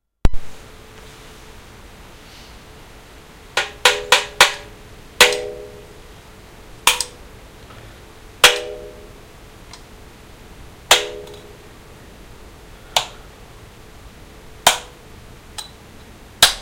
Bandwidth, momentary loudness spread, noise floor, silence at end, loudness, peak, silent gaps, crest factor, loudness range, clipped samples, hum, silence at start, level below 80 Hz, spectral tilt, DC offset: 16 kHz; 28 LU; -42 dBFS; 0 s; -16 LUFS; 0 dBFS; none; 22 dB; 11 LU; under 0.1%; none; 0.25 s; -36 dBFS; -0.5 dB/octave; under 0.1%